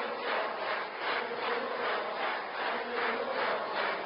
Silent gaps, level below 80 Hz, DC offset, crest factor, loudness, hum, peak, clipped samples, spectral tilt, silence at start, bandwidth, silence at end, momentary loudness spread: none; -78 dBFS; under 0.1%; 14 dB; -33 LUFS; none; -18 dBFS; under 0.1%; 1 dB/octave; 0 s; 5.4 kHz; 0 s; 2 LU